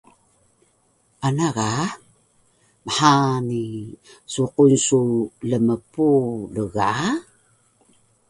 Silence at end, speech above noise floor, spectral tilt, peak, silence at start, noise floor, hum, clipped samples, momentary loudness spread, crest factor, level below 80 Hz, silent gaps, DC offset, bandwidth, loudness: 1.1 s; 43 dB; -5 dB/octave; 0 dBFS; 1.2 s; -63 dBFS; none; under 0.1%; 14 LU; 22 dB; -56 dBFS; none; under 0.1%; 11.5 kHz; -21 LUFS